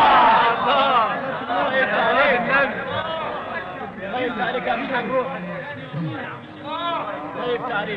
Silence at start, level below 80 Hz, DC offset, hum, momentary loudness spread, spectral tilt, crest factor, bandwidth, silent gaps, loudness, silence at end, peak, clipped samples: 0 s; -54 dBFS; under 0.1%; none; 14 LU; -6.5 dB/octave; 16 dB; 7.2 kHz; none; -21 LUFS; 0 s; -6 dBFS; under 0.1%